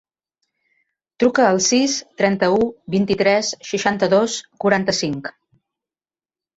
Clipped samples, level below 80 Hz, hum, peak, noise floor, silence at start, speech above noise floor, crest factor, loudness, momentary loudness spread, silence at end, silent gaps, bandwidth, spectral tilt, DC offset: under 0.1%; -56 dBFS; none; -4 dBFS; under -90 dBFS; 1.2 s; over 72 dB; 16 dB; -18 LUFS; 8 LU; 1.25 s; none; 8.2 kHz; -4 dB/octave; under 0.1%